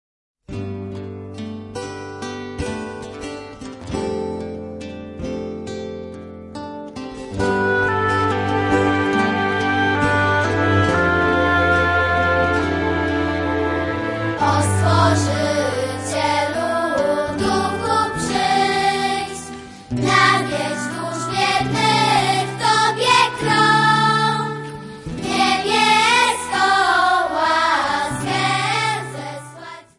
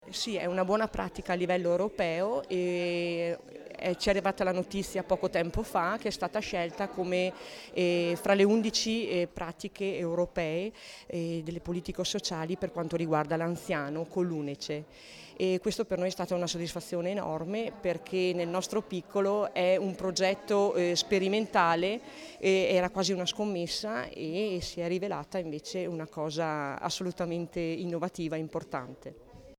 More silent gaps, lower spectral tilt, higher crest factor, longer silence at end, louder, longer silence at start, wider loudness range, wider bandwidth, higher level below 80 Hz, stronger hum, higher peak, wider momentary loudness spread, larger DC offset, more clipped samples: neither; about the same, -4.5 dB/octave vs -4.5 dB/octave; about the same, 18 dB vs 20 dB; first, 0.2 s vs 0.05 s; first, -18 LUFS vs -31 LUFS; first, 0.5 s vs 0 s; first, 12 LU vs 6 LU; second, 11.5 kHz vs 17 kHz; first, -46 dBFS vs -56 dBFS; neither; first, -2 dBFS vs -12 dBFS; first, 17 LU vs 9 LU; neither; neither